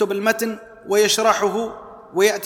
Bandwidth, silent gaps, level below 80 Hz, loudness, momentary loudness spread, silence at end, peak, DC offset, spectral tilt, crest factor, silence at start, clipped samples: 18.5 kHz; none; -60 dBFS; -19 LUFS; 14 LU; 0 s; -2 dBFS; under 0.1%; -2.5 dB/octave; 18 dB; 0 s; under 0.1%